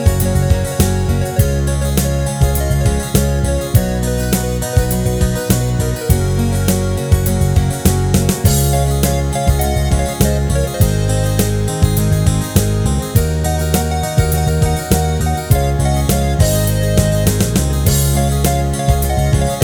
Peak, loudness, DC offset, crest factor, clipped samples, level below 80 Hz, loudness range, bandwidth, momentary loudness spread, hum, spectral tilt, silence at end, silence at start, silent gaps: 0 dBFS; -15 LUFS; under 0.1%; 14 dB; under 0.1%; -20 dBFS; 1 LU; over 20 kHz; 3 LU; none; -5.5 dB/octave; 0 s; 0 s; none